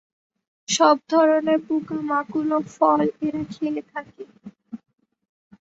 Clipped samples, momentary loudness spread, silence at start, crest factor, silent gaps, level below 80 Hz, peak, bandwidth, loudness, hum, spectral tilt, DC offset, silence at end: under 0.1%; 24 LU; 0.7 s; 20 dB; none; -66 dBFS; -2 dBFS; 8 kHz; -21 LUFS; none; -4 dB/octave; under 0.1%; 0.85 s